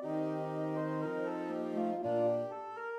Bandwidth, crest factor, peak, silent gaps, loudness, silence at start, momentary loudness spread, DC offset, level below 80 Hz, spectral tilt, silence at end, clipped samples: 11 kHz; 14 dB; -22 dBFS; none; -36 LUFS; 0 s; 5 LU; under 0.1%; -86 dBFS; -8.5 dB/octave; 0 s; under 0.1%